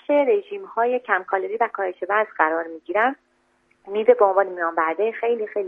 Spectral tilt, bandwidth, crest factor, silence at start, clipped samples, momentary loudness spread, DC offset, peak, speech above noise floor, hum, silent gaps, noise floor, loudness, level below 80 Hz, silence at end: -6.5 dB/octave; 3.7 kHz; 20 dB; 0.1 s; under 0.1%; 8 LU; under 0.1%; -2 dBFS; 43 dB; none; none; -64 dBFS; -22 LUFS; -74 dBFS; 0 s